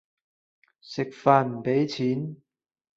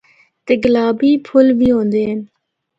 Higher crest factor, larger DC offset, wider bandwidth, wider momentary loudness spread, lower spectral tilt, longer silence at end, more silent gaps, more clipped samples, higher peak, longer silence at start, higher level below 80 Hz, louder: first, 22 dB vs 14 dB; neither; about the same, 7.8 kHz vs 7.6 kHz; first, 13 LU vs 10 LU; about the same, -7 dB/octave vs -8 dB/octave; about the same, 0.6 s vs 0.55 s; neither; neither; second, -4 dBFS vs 0 dBFS; first, 0.85 s vs 0.45 s; second, -70 dBFS vs -46 dBFS; second, -25 LUFS vs -14 LUFS